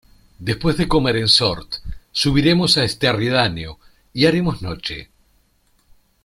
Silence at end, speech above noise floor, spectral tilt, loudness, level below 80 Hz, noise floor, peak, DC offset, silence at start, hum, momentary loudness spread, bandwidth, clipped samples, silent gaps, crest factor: 1.2 s; 42 dB; -5 dB/octave; -17 LUFS; -38 dBFS; -60 dBFS; -2 dBFS; under 0.1%; 0.4 s; none; 16 LU; 14.5 kHz; under 0.1%; none; 18 dB